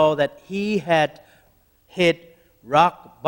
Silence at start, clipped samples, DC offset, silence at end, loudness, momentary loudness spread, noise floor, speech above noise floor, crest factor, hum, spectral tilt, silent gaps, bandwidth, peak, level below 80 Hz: 0 s; under 0.1%; under 0.1%; 0 s; -21 LUFS; 9 LU; -59 dBFS; 39 dB; 20 dB; none; -5.5 dB/octave; none; 16.5 kHz; -2 dBFS; -58 dBFS